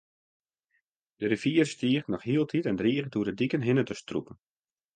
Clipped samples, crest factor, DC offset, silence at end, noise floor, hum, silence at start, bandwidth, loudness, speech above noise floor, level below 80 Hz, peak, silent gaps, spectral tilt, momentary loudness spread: under 0.1%; 18 dB; under 0.1%; 0.6 s; -77 dBFS; none; 1.2 s; 9.6 kHz; -28 LUFS; 49 dB; -64 dBFS; -12 dBFS; none; -6.5 dB/octave; 8 LU